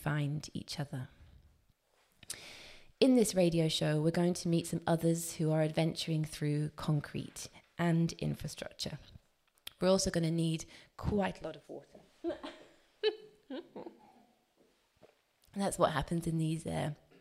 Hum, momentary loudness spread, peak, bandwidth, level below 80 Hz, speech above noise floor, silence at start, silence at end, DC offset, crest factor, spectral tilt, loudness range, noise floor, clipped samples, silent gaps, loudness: none; 19 LU; -10 dBFS; 16 kHz; -60 dBFS; 39 dB; 0 s; 0.25 s; under 0.1%; 24 dB; -5.5 dB/octave; 11 LU; -72 dBFS; under 0.1%; none; -34 LUFS